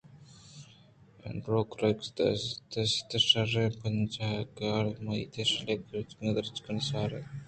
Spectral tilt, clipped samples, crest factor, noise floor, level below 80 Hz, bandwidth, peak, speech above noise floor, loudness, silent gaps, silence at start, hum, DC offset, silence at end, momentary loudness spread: -5 dB/octave; under 0.1%; 22 dB; -58 dBFS; -60 dBFS; 9 kHz; -10 dBFS; 26 dB; -31 LUFS; none; 0.1 s; none; under 0.1%; 0.05 s; 13 LU